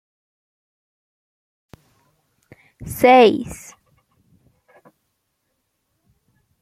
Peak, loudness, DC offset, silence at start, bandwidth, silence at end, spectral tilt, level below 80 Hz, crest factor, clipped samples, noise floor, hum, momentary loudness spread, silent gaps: -2 dBFS; -14 LUFS; under 0.1%; 2.85 s; 15.5 kHz; 3.05 s; -4.5 dB/octave; -54 dBFS; 22 dB; under 0.1%; -73 dBFS; none; 27 LU; none